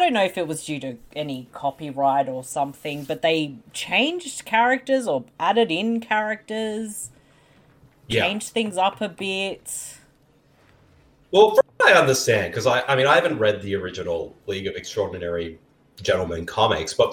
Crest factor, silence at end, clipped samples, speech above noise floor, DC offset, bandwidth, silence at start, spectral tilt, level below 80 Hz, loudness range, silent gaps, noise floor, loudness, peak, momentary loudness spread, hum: 20 dB; 0 s; under 0.1%; 36 dB; under 0.1%; 17.5 kHz; 0 s; -3.5 dB/octave; -58 dBFS; 8 LU; none; -58 dBFS; -22 LUFS; -2 dBFS; 14 LU; none